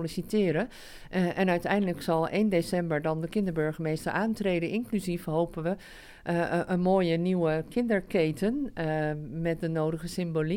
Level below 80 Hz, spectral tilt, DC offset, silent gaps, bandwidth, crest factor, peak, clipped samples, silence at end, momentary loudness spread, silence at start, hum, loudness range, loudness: -52 dBFS; -7 dB/octave; under 0.1%; none; 17 kHz; 16 dB; -12 dBFS; under 0.1%; 0 s; 6 LU; 0 s; none; 2 LU; -29 LUFS